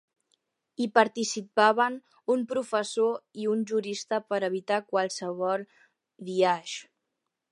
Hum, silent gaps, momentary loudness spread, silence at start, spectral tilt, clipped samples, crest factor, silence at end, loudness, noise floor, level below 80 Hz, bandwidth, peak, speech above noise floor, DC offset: none; none; 10 LU; 0.8 s; -3.5 dB/octave; under 0.1%; 24 dB; 0.7 s; -28 LUFS; -83 dBFS; -84 dBFS; 11.5 kHz; -4 dBFS; 56 dB; under 0.1%